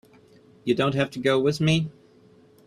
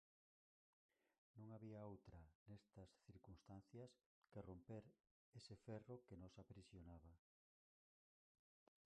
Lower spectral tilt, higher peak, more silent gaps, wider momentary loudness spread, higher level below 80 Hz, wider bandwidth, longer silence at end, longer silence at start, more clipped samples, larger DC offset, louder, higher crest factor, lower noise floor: about the same, -6 dB/octave vs -7 dB/octave; first, -8 dBFS vs -44 dBFS; second, none vs 2.35-2.46 s, 4.06-4.22 s, 5.11-5.32 s; about the same, 9 LU vs 9 LU; first, -60 dBFS vs -76 dBFS; first, 13 kHz vs 8.8 kHz; second, 0.75 s vs 1.8 s; second, 0.65 s vs 1.35 s; neither; neither; first, -24 LUFS vs -63 LUFS; about the same, 18 dB vs 20 dB; second, -55 dBFS vs under -90 dBFS